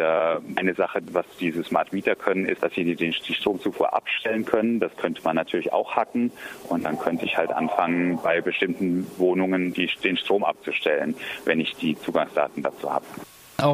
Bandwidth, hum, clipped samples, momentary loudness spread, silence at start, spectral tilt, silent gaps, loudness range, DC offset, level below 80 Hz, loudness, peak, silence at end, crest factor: 15.5 kHz; none; under 0.1%; 5 LU; 0 s; -6 dB/octave; none; 2 LU; under 0.1%; -64 dBFS; -25 LUFS; -4 dBFS; 0 s; 22 dB